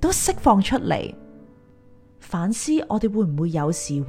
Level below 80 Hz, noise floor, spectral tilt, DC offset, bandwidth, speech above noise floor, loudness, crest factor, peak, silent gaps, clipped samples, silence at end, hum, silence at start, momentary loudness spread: -40 dBFS; -50 dBFS; -5 dB/octave; under 0.1%; 16 kHz; 29 dB; -22 LUFS; 20 dB; -4 dBFS; none; under 0.1%; 0 s; none; 0 s; 9 LU